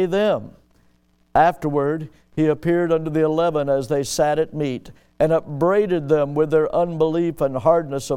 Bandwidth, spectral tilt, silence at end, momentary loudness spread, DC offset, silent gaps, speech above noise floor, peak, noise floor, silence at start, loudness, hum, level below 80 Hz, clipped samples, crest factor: 16 kHz; -6.5 dB/octave; 0 s; 6 LU; under 0.1%; none; 40 dB; -4 dBFS; -60 dBFS; 0 s; -20 LUFS; none; -48 dBFS; under 0.1%; 16 dB